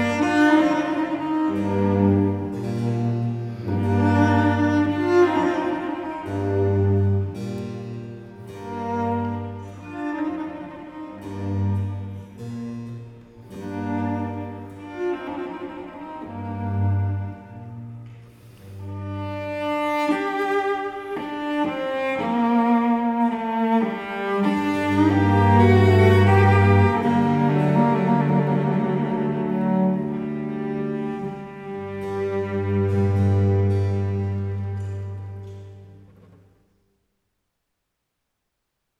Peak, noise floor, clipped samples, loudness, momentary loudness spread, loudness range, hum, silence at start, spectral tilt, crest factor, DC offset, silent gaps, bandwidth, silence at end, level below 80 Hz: -4 dBFS; -78 dBFS; under 0.1%; -22 LUFS; 18 LU; 13 LU; none; 0 s; -8.5 dB/octave; 18 dB; under 0.1%; none; 8.6 kHz; 3 s; -58 dBFS